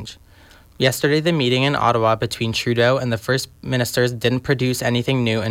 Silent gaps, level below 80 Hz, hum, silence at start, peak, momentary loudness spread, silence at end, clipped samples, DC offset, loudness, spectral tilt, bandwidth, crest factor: none; -50 dBFS; none; 0 s; -4 dBFS; 5 LU; 0 s; under 0.1%; under 0.1%; -19 LUFS; -5 dB/octave; 16.5 kHz; 14 dB